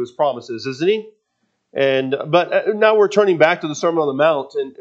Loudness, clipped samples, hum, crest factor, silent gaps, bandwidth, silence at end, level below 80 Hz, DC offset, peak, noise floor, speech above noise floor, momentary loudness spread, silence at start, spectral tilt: -17 LUFS; under 0.1%; none; 18 dB; none; 7.8 kHz; 0.1 s; -76 dBFS; under 0.1%; 0 dBFS; -70 dBFS; 53 dB; 9 LU; 0 s; -5 dB/octave